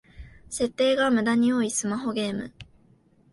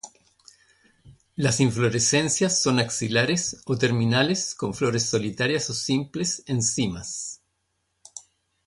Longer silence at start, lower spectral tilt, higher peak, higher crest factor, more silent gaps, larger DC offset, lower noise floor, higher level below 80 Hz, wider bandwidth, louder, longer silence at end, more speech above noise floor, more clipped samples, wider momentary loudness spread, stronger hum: about the same, 0.15 s vs 0.05 s; about the same, -4 dB/octave vs -4 dB/octave; second, -10 dBFS vs -6 dBFS; about the same, 16 dB vs 18 dB; neither; neither; second, -60 dBFS vs -74 dBFS; about the same, -54 dBFS vs -56 dBFS; about the same, 11.5 kHz vs 11.5 kHz; about the same, -24 LUFS vs -23 LUFS; first, 0.7 s vs 0.45 s; second, 35 dB vs 51 dB; neither; second, 12 LU vs 16 LU; neither